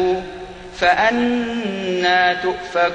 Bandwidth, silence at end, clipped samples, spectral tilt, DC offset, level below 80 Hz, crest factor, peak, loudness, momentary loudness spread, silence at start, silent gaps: 9.4 kHz; 0 s; under 0.1%; -4.5 dB/octave; under 0.1%; -46 dBFS; 16 dB; -2 dBFS; -18 LUFS; 13 LU; 0 s; none